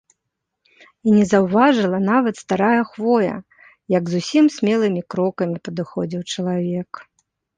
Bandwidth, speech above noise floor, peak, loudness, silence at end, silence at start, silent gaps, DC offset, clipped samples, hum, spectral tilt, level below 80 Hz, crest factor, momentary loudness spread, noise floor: 9.6 kHz; 60 dB; -2 dBFS; -19 LUFS; 0.55 s; 1.05 s; none; under 0.1%; under 0.1%; none; -6.5 dB/octave; -60 dBFS; 18 dB; 11 LU; -78 dBFS